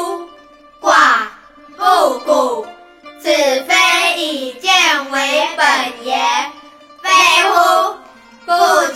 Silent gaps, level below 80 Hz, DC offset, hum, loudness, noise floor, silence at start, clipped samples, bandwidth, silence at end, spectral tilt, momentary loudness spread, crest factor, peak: none; -62 dBFS; under 0.1%; none; -13 LUFS; -43 dBFS; 0 s; under 0.1%; 16.5 kHz; 0 s; 0.5 dB/octave; 14 LU; 14 dB; 0 dBFS